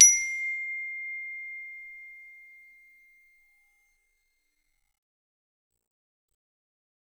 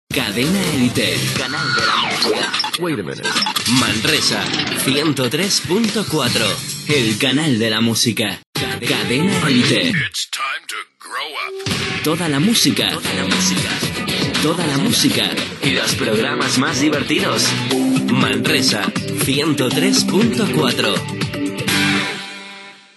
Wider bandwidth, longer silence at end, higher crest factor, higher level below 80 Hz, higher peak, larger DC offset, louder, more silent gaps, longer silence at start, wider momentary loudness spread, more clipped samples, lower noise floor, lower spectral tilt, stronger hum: first, 19 kHz vs 12.5 kHz; first, 4.85 s vs 0.2 s; first, 30 dB vs 18 dB; second, -70 dBFS vs -50 dBFS; about the same, -2 dBFS vs 0 dBFS; neither; second, -27 LUFS vs -16 LUFS; second, none vs 8.46-8.53 s; about the same, 0 s vs 0.1 s; first, 21 LU vs 8 LU; neither; first, -75 dBFS vs -38 dBFS; second, 6 dB/octave vs -3.5 dB/octave; neither